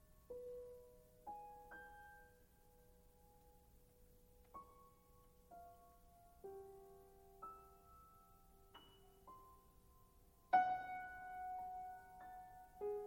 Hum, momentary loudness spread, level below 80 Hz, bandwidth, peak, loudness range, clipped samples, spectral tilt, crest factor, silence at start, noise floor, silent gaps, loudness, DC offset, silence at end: none; 22 LU; -72 dBFS; 16.5 kHz; -24 dBFS; 20 LU; under 0.1%; -4.5 dB/octave; 28 dB; 0 s; -69 dBFS; none; -48 LUFS; under 0.1%; 0 s